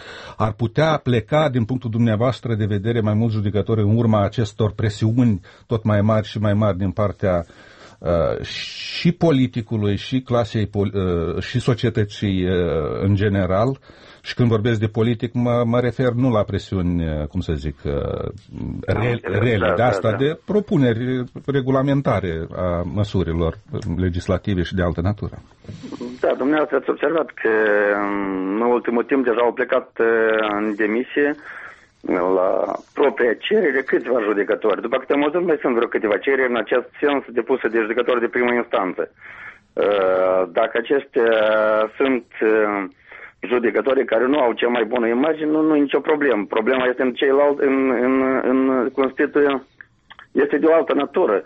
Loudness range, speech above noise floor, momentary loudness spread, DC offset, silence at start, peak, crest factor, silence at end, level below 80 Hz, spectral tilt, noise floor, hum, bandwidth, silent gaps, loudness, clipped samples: 3 LU; 28 dB; 8 LU; under 0.1%; 0 s; -6 dBFS; 14 dB; 0 s; -42 dBFS; -8 dB/octave; -47 dBFS; none; 8.4 kHz; none; -20 LUFS; under 0.1%